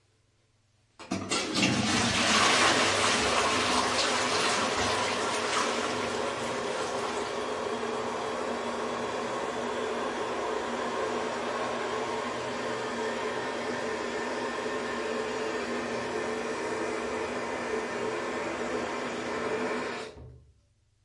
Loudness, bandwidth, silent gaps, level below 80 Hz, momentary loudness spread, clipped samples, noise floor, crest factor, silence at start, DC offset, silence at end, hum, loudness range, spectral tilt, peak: -29 LUFS; 11.5 kHz; none; -60 dBFS; 8 LU; under 0.1%; -68 dBFS; 20 dB; 1 s; under 0.1%; 0.7 s; none; 8 LU; -2.5 dB/octave; -12 dBFS